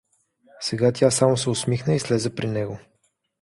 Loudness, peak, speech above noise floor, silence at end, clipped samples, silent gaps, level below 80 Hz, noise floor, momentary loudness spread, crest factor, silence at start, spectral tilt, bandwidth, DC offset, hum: -22 LUFS; -4 dBFS; 48 dB; 0.6 s; under 0.1%; none; -56 dBFS; -70 dBFS; 11 LU; 20 dB; 0.6 s; -5 dB/octave; 11.5 kHz; under 0.1%; none